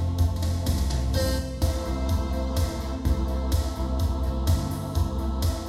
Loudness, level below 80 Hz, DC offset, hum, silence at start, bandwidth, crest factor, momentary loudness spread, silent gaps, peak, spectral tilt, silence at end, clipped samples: -27 LUFS; -28 dBFS; under 0.1%; none; 0 s; 16 kHz; 16 dB; 3 LU; none; -10 dBFS; -6 dB/octave; 0 s; under 0.1%